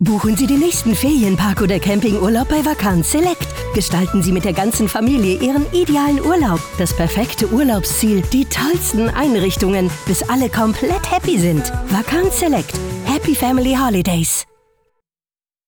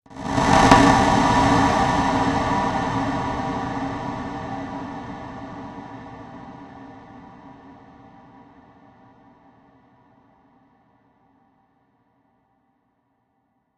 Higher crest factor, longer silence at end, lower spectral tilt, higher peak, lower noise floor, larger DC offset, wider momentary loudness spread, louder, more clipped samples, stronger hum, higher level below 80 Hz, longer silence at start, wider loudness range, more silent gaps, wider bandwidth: second, 10 dB vs 24 dB; second, 1.25 s vs 6.05 s; about the same, -5 dB/octave vs -5 dB/octave; second, -6 dBFS vs 0 dBFS; first, under -90 dBFS vs -69 dBFS; neither; second, 4 LU vs 26 LU; first, -16 LUFS vs -20 LUFS; neither; neither; first, -30 dBFS vs -40 dBFS; about the same, 0 s vs 0.1 s; second, 1 LU vs 26 LU; neither; first, over 20 kHz vs 12.5 kHz